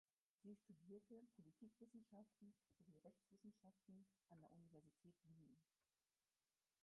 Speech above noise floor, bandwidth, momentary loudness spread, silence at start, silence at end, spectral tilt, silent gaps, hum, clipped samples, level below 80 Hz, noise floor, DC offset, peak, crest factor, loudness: over 21 dB; 1.8 kHz; 5 LU; 0.45 s; 1.2 s; -6 dB/octave; none; none; under 0.1%; under -90 dBFS; under -90 dBFS; under 0.1%; -54 dBFS; 16 dB; -68 LUFS